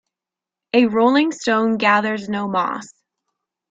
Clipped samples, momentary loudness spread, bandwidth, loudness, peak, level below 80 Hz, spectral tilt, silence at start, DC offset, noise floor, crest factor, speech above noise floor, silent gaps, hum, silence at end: under 0.1%; 8 LU; 7.8 kHz; -18 LUFS; -2 dBFS; -66 dBFS; -5 dB/octave; 0.75 s; under 0.1%; -88 dBFS; 18 dB; 70 dB; none; none; 0.85 s